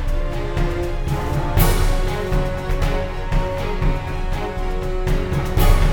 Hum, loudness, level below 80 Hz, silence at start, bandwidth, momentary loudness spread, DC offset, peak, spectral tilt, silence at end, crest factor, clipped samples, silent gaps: none; -22 LUFS; -20 dBFS; 0 s; 19 kHz; 7 LU; under 0.1%; -2 dBFS; -6 dB/octave; 0 s; 16 dB; under 0.1%; none